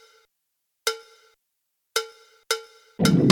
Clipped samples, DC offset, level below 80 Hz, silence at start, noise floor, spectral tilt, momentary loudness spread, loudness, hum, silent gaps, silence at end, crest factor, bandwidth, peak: under 0.1%; under 0.1%; -58 dBFS; 0.85 s; -78 dBFS; -5 dB/octave; 19 LU; -26 LUFS; none; none; 0 s; 26 dB; 19 kHz; 0 dBFS